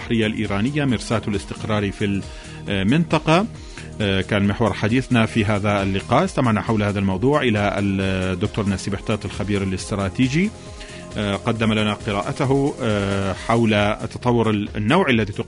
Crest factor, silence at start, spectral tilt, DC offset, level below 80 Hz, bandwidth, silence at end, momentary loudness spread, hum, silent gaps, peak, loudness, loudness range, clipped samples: 18 dB; 0 s; -6 dB/octave; under 0.1%; -40 dBFS; 11 kHz; 0 s; 7 LU; none; none; -2 dBFS; -21 LUFS; 3 LU; under 0.1%